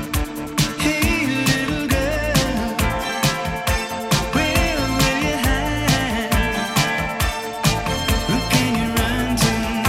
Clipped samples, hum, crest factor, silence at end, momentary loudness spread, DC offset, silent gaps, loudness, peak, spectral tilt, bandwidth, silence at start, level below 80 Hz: under 0.1%; none; 18 dB; 0 s; 4 LU; under 0.1%; none; -20 LUFS; -2 dBFS; -4 dB/octave; 17 kHz; 0 s; -28 dBFS